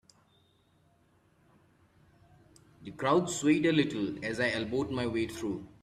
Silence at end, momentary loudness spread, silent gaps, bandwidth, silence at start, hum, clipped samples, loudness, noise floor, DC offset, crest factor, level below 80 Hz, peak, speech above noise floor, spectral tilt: 0.15 s; 11 LU; none; 13.5 kHz; 2.8 s; none; under 0.1%; -30 LUFS; -67 dBFS; under 0.1%; 20 dB; -64 dBFS; -12 dBFS; 37 dB; -5 dB/octave